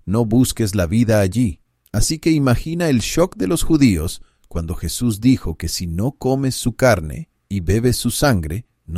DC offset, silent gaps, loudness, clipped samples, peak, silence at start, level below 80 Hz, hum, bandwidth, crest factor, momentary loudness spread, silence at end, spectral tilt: under 0.1%; none; -18 LUFS; under 0.1%; -2 dBFS; 0.05 s; -32 dBFS; none; 16 kHz; 16 dB; 11 LU; 0 s; -5.5 dB/octave